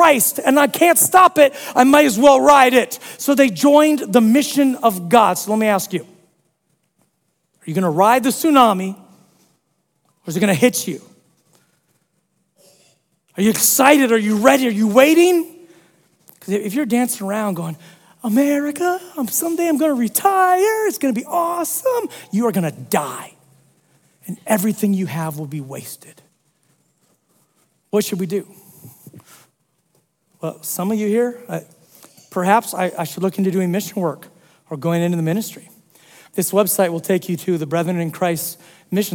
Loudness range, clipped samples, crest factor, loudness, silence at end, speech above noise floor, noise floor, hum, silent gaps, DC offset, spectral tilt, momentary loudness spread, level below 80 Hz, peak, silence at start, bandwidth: 12 LU; under 0.1%; 18 dB; -16 LUFS; 0 s; 52 dB; -68 dBFS; none; none; under 0.1%; -4.5 dB/octave; 17 LU; -64 dBFS; 0 dBFS; 0 s; 18 kHz